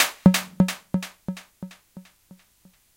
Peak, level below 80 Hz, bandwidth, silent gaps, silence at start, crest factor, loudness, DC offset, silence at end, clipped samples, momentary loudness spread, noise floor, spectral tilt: 0 dBFS; -50 dBFS; 17 kHz; none; 0 s; 26 dB; -23 LUFS; under 0.1%; 0.95 s; under 0.1%; 23 LU; -59 dBFS; -5 dB/octave